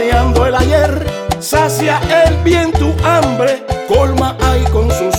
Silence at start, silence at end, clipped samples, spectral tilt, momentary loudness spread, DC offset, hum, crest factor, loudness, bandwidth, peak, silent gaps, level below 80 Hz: 0 s; 0 s; under 0.1%; -5.5 dB/octave; 4 LU; under 0.1%; none; 12 dB; -12 LUFS; 18 kHz; 0 dBFS; none; -20 dBFS